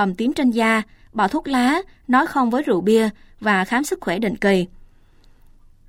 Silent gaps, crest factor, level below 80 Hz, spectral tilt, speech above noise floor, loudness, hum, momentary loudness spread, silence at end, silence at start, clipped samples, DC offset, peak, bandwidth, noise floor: none; 16 dB; -48 dBFS; -5.5 dB/octave; 31 dB; -20 LUFS; none; 7 LU; 1.2 s; 0 s; under 0.1%; under 0.1%; -4 dBFS; 16.5 kHz; -50 dBFS